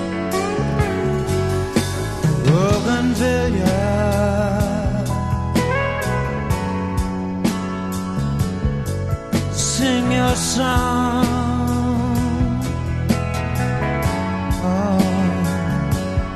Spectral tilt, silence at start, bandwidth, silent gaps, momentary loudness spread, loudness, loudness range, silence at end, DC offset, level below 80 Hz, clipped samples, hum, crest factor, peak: -5.5 dB/octave; 0 s; 13.5 kHz; none; 5 LU; -20 LUFS; 3 LU; 0 s; under 0.1%; -28 dBFS; under 0.1%; none; 16 dB; -2 dBFS